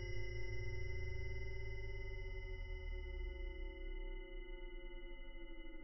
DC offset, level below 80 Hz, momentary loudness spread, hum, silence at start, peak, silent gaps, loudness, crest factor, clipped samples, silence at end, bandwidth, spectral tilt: under 0.1%; -48 dBFS; 8 LU; none; 0 s; -32 dBFS; none; -50 LUFS; 12 dB; under 0.1%; 0 s; 5.8 kHz; -5 dB/octave